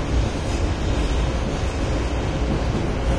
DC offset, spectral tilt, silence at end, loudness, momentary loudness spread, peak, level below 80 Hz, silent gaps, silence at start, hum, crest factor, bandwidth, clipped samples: under 0.1%; -6 dB/octave; 0 s; -24 LUFS; 1 LU; -10 dBFS; -24 dBFS; none; 0 s; none; 12 dB; 11 kHz; under 0.1%